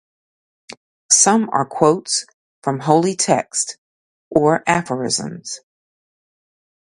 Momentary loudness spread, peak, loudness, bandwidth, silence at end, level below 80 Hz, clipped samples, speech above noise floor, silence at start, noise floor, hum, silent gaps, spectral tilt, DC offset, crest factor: 14 LU; 0 dBFS; -17 LUFS; 11.5 kHz; 1.25 s; -60 dBFS; under 0.1%; over 73 dB; 0.7 s; under -90 dBFS; none; 0.77-1.09 s, 2.34-2.62 s, 3.78-4.31 s; -3.5 dB/octave; under 0.1%; 20 dB